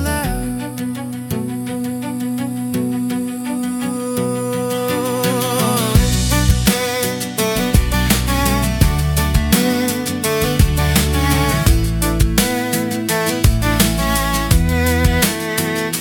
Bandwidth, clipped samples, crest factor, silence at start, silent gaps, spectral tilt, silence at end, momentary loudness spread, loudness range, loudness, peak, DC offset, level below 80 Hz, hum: 19 kHz; under 0.1%; 16 dB; 0 s; none; -4.5 dB/octave; 0 s; 8 LU; 6 LU; -17 LUFS; 0 dBFS; under 0.1%; -24 dBFS; none